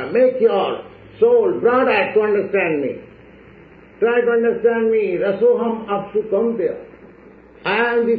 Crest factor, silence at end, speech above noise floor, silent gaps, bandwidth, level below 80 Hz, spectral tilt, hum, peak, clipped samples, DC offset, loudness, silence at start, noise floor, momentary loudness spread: 14 dB; 0 s; 27 dB; none; 4.9 kHz; -58 dBFS; -3.5 dB/octave; none; -4 dBFS; under 0.1%; under 0.1%; -18 LUFS; 0 s; -44 dBFS; 9 LU